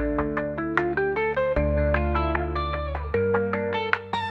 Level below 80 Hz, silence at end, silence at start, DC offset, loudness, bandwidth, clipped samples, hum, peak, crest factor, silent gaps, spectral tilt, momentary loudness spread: -34 dBFS; 0 s; 0 s; under 0.1%; -25 LUFS; 7.2 kHz; under 0.1%; none; -4 dBFS; 20 dB; none; -8 dB/octave; 4 LU